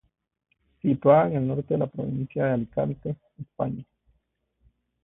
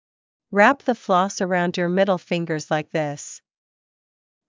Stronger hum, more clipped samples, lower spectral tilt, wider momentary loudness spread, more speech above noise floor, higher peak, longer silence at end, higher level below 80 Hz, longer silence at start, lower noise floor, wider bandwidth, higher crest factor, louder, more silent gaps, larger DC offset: neither; neither; first, -12.5 dB/octave vs -5 dB/octave; first, 16 LU vs 11 LU; second, 49 dB vs over 69 dB; second, -6 dBFS vs -2 dBFS; about the same, 1.2 s vs 1.1 s; first, -58 dBFS vs -74 dBFS; first, 0.85 s vs 0.5 s; second, -73 dBFS vs under -90 dBFS; second, 3.9 kHz vs 7.6 kHz; about the same, 22 dB vs 20 dB; second, -25 LUFS vs -21 LUFS; neither; neither